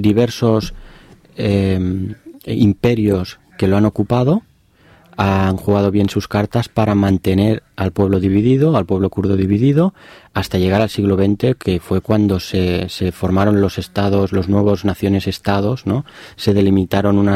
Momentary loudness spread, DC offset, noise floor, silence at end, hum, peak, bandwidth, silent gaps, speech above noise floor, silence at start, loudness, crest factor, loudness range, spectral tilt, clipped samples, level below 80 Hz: 7 LU; under 0.1%; -50 dBFS; 0 s; none; 0 dBFS; 15 kHz; none; 34 dB; 0 s; -16 LUFS; 14 dB; 2 LU; -7.5 dB/octave; under 0.1%; -40 dBFS